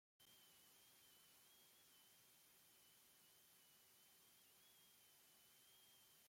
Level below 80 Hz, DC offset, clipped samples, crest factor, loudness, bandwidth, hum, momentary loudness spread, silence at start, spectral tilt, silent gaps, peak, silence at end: under -90 dBFS; under 0.1%; under 0.1%; 14 dB; -69 LUFS; 16.5 kHz; none; 1 LU; 0.2 s; -0.5 dB/octave; none; -58 dBFS; 0 s